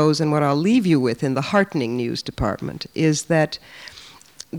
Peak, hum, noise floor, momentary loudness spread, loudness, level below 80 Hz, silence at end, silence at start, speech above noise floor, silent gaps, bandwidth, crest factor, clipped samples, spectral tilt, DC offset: -4 dBFS; none; -43 dBFS; 16 LU; -21 LUFS; -44 dBFS; 0 s; 0 s; 23 dB; none; 19 kHz; 16 dB; under 0.1%; -5.5 dB/octave; under 0.1%